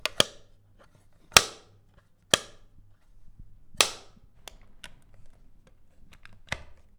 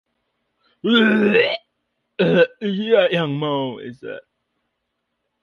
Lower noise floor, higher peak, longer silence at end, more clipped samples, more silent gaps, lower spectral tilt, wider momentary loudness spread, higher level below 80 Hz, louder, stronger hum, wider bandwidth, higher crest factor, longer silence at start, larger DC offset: second, -60 dBFS vs -75 dBFS; about the same, 0 dBFS vs -2 dBFS; second, 0.25 s vs 1.25 s; neither; neither; second, -0.5 dB/octave vs -7.5 dB/octave; first, 29 LU vs 19 LU; first, -54 dBFS vs -64 dBFS; second, -25 LUFS vs -18 LUFS; neither; first, over 20 kHz vs 6.8 kHz; first, 32 dB vs 18 dB; second, 0.05 s vs 0.85 s; neither